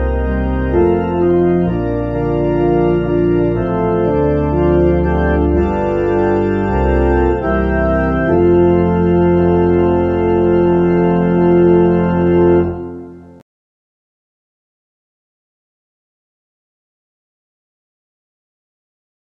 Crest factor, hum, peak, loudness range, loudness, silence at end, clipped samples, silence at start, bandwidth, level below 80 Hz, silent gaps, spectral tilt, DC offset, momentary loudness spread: 14 dB; none; 0 dBFS; 3 LU; -14 LUFS; 6.1 s; under 0.1%; 0 s; 3.7 kHz; -26 dBFS; none; -10.5 dB/octave; under 0.1%; 5 LU